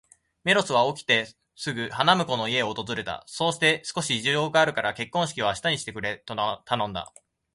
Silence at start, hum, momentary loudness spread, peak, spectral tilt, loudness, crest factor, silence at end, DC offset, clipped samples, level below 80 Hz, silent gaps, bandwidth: 0.45 s; none; 10 LU; -4 dBFS; -3.5 dB/octave; -25 LUFS; 22 dB; 0.5 s; under 0.1%; under 0.1%; -60 dBFS; none; 11.5 kHz